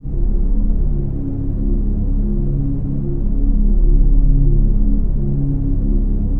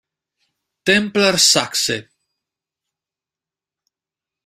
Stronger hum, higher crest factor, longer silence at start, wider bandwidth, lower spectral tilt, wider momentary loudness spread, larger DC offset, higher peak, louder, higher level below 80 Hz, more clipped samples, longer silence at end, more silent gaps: neither; second, 12 dB vs 22 dB; second, 0.05 s vs 0.85 s; second, 1.2 kHz vs 16 kHz; first, -13.5 dB/octave vs -2 dB/octave; second, 5 LU vs 11 LU; neither; about the same, -2 dBFS vs 0 dBFS; second, -20 LUFS vs -15 LUFS; first, -14 dBFS vs -60 dBFS; neither; second, 0 s vs 2.45 s; neither